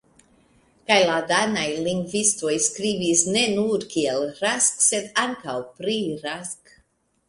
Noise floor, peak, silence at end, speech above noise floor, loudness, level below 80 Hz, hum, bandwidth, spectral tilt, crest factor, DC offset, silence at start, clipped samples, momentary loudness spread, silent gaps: -64 dBFS; -2 dBFS; 0.75 s; 42 dB; -22 LUFS; -62 dBFS; none; 11.5 kHz; -2 dB/octave; 22 dB; under 0.1%; 0.9 s; under 0.1%; 12 LU; none